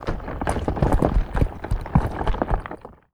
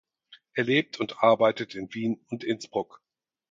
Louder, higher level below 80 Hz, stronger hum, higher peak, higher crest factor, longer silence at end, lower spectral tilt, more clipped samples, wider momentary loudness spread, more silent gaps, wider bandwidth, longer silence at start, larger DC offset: about the same, -25 LUFS vs -27 LUFS; first, -26 dBFS vs -72 dBFS; neither; first, -2 dBFS vs -6 dBFS; about the same, 20 dB vs 22 dB; second, 0.2 s vs 0.7 s; first, -7.5 dB/octave vs -5.5 dB/octave; neither; second, 9 LU vs 13 LU; neither; first, 12.5 kHz vs 7.6 kHz; second, 0 s vs 0.3 s; neither